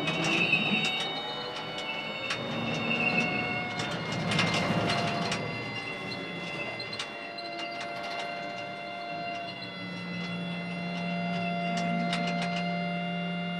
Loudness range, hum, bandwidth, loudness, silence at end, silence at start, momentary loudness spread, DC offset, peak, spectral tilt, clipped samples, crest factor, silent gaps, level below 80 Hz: 7 LU; none; 12 kHz; -31 LUFS; 0 s; 0 s; 10 LU; under 0.1%; -12 dBFS; -4.5 dB/octave; under 0.1%; 20 dB; none; -64 dBFS